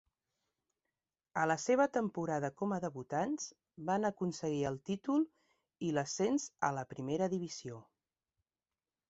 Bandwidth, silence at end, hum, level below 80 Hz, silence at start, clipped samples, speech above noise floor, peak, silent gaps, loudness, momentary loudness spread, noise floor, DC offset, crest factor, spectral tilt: 8 kHz; 1.3 s; none; -74 dBFS; 1.35 s; under 0.1%; over 54 dB; -16 dBFS; none; -36 LUFS; 10 LU; under -90 dBFS; under 0.1%; 20 dB; -5.5 dB/octave